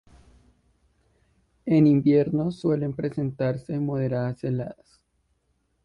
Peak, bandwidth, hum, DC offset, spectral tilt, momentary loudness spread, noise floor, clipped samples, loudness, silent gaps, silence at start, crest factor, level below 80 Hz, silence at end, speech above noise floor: -8 dBFS; 6.6 kHz; none; under 0.1%; -10 dB/octave; 11 LU; -71 dBFS; under 0.1%; -24 LUFS; none; 1.65 s; 18 dB; -58 dBFS; 1.1 s; 48 dB